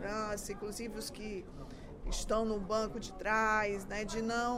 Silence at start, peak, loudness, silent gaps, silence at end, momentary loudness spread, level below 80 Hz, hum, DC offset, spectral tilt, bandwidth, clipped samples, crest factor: 0 s; -18 dBFS; -36 LUFS; none; 0 s; 14 LU; -48 dBFS; none; under 0.1%; -4 dB/octave; 16 kHz; under 0.1%; 18 dB